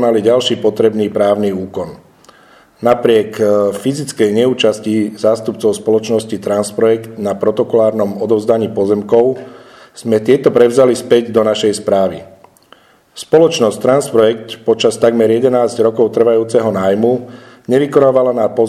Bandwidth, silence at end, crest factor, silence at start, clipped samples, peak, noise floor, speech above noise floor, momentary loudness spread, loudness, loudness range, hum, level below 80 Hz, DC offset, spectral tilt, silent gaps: 13 kHz; 0 s; 12 dB; 0 s; 0.1%; 0 dBFS; -46 dBFS; 34 dB; 8 LU; -13 LUFS; 2 LU; none; -56 dBFS; under 0.1%; -5.5 dB/octave; none